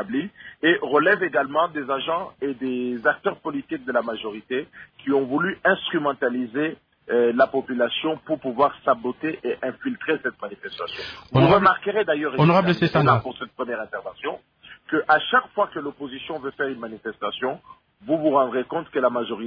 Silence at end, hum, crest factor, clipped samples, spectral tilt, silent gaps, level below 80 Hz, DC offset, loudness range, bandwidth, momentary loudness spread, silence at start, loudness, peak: 0 s; none; 20 dB; under 0.1%; -8.5 dB/octave; none; -58 dBFS; under 0.1%; 6 LU; 5.4 kHz; 13 LU; 0 s; -23 LUFS; -4 dBFS